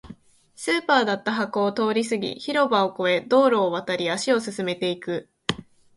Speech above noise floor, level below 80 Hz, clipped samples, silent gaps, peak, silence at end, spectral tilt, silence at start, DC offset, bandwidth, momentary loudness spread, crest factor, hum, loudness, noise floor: 24 dB; -62 dBFS; under 0.1%; none; -2 dBFS; 0.35 s; -4 dB/octave; 0.05 s; under 0.1%; 11.5 kHz; 10 LU; 22 dB; none; -23 LUFS; -47 dBFS